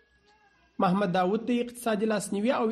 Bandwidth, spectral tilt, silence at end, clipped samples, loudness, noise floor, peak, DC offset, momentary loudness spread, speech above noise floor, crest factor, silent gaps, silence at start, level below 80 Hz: 13 kHz; -6 dB/octave; 0 s; under 0.1%; -28 LUFS; -63 dBFS; -12 dBFS; under 0.1%; 4 LU; 37 dB; 16 dB; none; 0.8 s; -68 dBFS